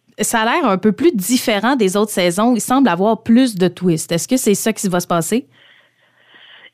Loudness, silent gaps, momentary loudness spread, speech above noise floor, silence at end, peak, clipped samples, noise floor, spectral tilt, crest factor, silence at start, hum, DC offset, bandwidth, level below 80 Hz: -16 LUFS; none; 5 LU; 39 dB; 1.3 s; -2 dBFS; under 0.1%; -55 dBFS; -4.5 dB/octave; 14 dB; 0.2 s; none; under 0.1%; 16 kHz; -56 dBFS